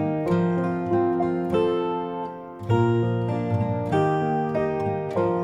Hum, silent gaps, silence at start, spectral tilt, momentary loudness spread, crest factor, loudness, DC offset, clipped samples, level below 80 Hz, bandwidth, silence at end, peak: none; none; 0 s; -9 dB/octave; 5 LU; 14 dB; -24 LUFS; under 0.1%; under 0.1%; -54 dBFS; 9.6 kHz; 0 s; -8 dBFS